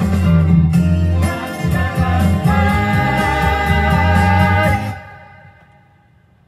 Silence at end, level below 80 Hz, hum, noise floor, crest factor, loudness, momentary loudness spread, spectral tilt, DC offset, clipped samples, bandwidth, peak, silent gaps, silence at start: 1.25 s; -28 dBFS; none; -51 dBFS; 14 dB; -15 LUFS; 7 LU; -7 dB/octave; under 0.1%; under 0.1%; 14.5 kHz; 0 dBFS; none; 0 s